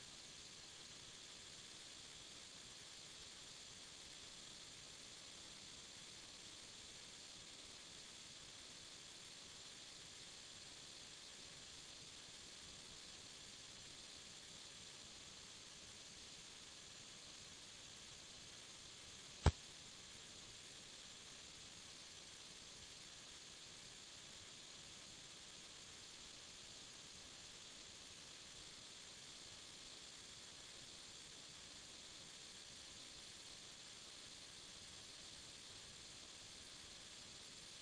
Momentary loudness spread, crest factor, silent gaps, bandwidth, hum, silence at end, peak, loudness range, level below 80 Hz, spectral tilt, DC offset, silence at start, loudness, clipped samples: 1 LU; 38 dB; none; 10.5 kHz; none; 0 s; -18 dBFS; 6 LU; -64 dBFS; -2.5 dB/octave; under 0.1%; 0 s; -54 LUFS; under 0.1%